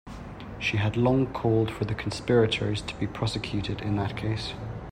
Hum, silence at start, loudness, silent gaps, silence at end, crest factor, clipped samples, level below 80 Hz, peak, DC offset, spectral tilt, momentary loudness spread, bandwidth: none; 0.05 s; -27 LUFS; none; 0 s; 16 dB; under 0.1%; -46 dBFS; -10 dBFS; under 0.1%; -6.5 dB/octave; 10 LU; 10.5 kHz